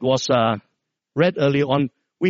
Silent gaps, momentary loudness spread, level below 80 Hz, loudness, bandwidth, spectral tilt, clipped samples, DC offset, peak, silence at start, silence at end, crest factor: none; 10 LU; -60 dBFS; -20 LUFS; 7.6 kHz; -5 dB/octave; under 0.1%; under 0.1%; -4 dBFS; 0 s; 0 s; 18 dB